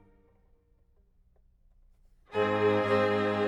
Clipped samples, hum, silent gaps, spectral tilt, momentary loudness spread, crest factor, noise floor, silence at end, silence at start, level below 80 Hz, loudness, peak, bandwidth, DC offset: under 0.1%; none; none; -7 dB/octave; 5 LU; 18 dB; -65 dBFS; 0 s; 2.3 s; -64 dBFS; -27 LUFS; -14 dBFS; 10 kHz; under 0.1%